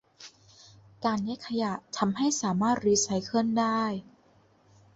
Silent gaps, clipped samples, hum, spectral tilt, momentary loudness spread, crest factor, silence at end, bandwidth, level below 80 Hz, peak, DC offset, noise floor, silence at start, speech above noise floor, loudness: none; under 0.1%; none; -4 dB/octave; 11 LU; 18 dB; 0.95 s; 8.2 kHz; -66 dBFS; -12 dBFS; under 0.1%; -62 dBFS; 0.2 s; 35 dB; -28 LUFS